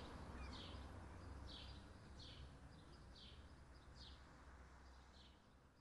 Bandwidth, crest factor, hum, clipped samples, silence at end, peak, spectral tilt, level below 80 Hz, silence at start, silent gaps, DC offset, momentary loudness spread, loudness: 11.5 kHz; 16 dB; none; under 0.1%; 0 s; -42 dBFS; -5 dB/octave; -62 dBFS; 0 s; none; under 0.1%; 10 LU; -60 LUFS